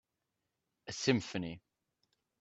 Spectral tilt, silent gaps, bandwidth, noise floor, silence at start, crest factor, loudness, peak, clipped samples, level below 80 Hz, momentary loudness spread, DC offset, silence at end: -4.5 dB/octave; none; 8.2 kHz; -87 dBFS; 0.85 s; 24 dB; -36 LUFS; -16 dBFS; under 0.1%; -72 dBFS; 20 LU; under 0.1%; 0.8 s